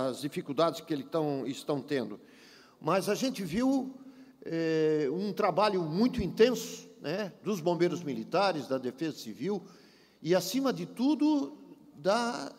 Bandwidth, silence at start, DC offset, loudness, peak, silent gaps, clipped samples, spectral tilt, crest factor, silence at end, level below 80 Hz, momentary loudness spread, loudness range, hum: 16 kHz; 0 s; under 0.1%; -31 LUFS; -12 dBFS; none; under 0.1%; -5.5 dB/octave; 20 dB; 0.05 s; -62 dBFS; 11 LU; 3 LU; none